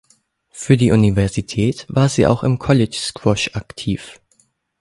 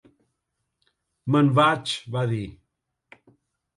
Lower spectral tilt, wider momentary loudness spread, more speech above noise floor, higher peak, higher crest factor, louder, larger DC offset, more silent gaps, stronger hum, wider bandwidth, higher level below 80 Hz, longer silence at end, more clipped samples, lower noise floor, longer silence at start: about the same, -6 dB/octave vs -6.5 dB/octave; second, 11 LU vs 16 LU; second, 44 dB vs 57 dB; first, 0 dBFS vs -6 dBFS; about the same, 18 dB vs 20 dB; first, -17 LUFS vs -22 LUFS; neither; neither; neither; about the same, 11.5 kHz vs 11.5 kHz; first, -40 dBFS vs -60 dBFS; second, 0.7 s vs 1.25 s; neither; second, -60 dBFS vs -79 dBFS; second, 0.55 s vs 1.25 s